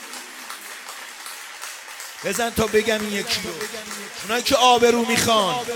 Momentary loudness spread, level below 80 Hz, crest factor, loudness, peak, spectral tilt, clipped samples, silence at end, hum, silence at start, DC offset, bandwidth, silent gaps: 18 LU; -52 dBFS; 22 dB; -20 LUFS; -2 dBFS; -2.5 dB/octave; under 0.1%; 0 s; none; 0 s; under 0.1%; 18 kHz; none